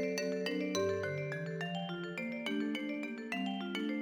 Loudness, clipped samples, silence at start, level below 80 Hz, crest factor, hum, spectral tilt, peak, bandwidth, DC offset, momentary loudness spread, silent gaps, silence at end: -37 LUFS; under 0.1%; 0 s; -84 dBFS; 16 dB; none; -5 dB/octave; -20 dBFS; over 20 kHz; under 0.1%; 5 LU; none; 0 s